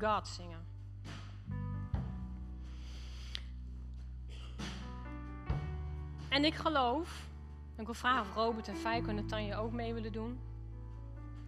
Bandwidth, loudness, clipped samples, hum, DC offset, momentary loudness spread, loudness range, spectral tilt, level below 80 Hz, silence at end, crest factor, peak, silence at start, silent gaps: 13 kHz; -39 LUFS; under 0.1%; none; under 0.1%; 16 LU; 10 LU; -5.5 dB/octave; -46 dBFS; 0 s; 22 dB; -18 dBFS; 0 s; none